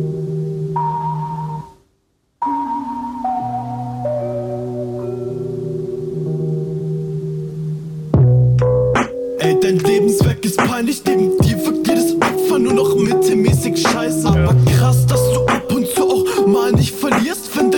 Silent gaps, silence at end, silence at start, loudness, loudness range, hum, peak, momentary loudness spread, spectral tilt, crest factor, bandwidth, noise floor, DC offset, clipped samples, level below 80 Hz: none; 0 s; 0 s; -17 LUFS; 9 LU; none; -2 dBFS; 11 LU; -6 dB/octave; 14 dB; 19 kHz; -64 dBFS; under 0.1%; under 0.1%; -36 dBFS